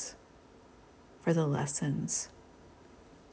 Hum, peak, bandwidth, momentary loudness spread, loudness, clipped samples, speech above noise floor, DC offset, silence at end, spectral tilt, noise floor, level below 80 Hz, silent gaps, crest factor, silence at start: none; -16 dBFS; 8 kHz; 13 LU; -33 LUFS; under 0.1%; 26 dB; under 0.1%; 0.2 s; -5 dB/octave; -58 dBFS; -64 dBFS; none; 20 dB; 0 s